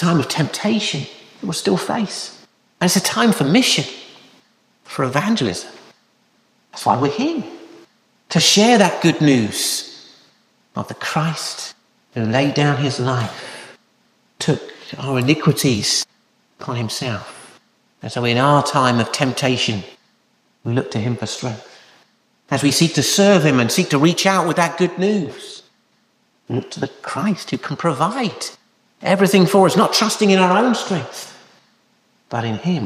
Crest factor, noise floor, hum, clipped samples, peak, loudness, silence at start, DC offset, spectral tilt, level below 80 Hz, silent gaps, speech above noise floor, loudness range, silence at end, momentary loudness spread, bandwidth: 18 dB; -62 dBFS; none; under 0.1%; -2 dBFS; -17 LUFS; 0 s; under 0.1%; -4.5 dB/octave; -60 dBFS; none; 44 dB; 7 LU; 0 s; 17 LU; 15.5 kHz